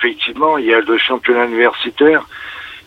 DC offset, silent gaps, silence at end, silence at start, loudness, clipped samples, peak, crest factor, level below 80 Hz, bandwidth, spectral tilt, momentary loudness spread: under 0.1%; none; 0.05 s; 0 s; -13 LUFS; under 0.1%; -2 dBFS; 14 dB; -54 dBFS; 6.2 kHz; -5 dB/octave; 12 LU